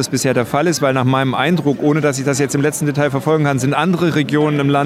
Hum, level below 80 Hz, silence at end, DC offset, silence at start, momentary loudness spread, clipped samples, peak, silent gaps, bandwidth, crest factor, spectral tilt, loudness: none; -54 dBFS; 0 s; under 0.1%; 0 s; 2 LU; under 0.1%; -2 dBFS; none; 15.5 kHz; 14 dB; -5.5 dB/octave; -16 LUFS